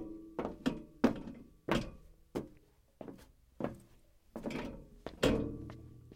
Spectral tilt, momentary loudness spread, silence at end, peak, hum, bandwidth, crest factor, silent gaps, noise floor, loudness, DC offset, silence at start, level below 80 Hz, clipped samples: -6 dB/octave; 18 LU; 0 s; -14 dBFS; none; 16.5 kHz; 26 dB; none; -64 dBFS; -39 LUFS; under 0.1%; 0 s; -54 dBFS; under 0.1%